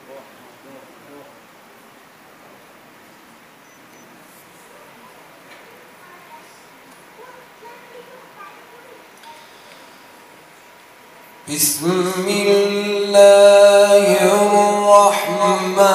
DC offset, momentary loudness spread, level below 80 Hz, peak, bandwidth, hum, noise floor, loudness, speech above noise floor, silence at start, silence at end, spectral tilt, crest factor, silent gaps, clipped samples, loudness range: under 0.1%; 11 LU; -70 dBFS; 0 dBFS; 15.5 kHz; none; -46 dBFS; -13 LUFS; 33 dB; 0.1 s; 0 s; -3.5 dB/octave; 18 dB; none; under 0.1%; 12 LU